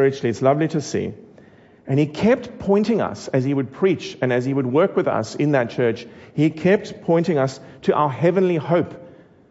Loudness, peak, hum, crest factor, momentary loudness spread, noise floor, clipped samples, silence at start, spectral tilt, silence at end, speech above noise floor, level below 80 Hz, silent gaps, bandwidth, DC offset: -20 LUFS; -4 dBFS; none; 16 dB; 6 LU; -48 dBFS; under 0.1%; 0 s; -7 dB/octave; 0.4 s; 29 dB; -58 dBFS; none; 8 kHz; under 0.1%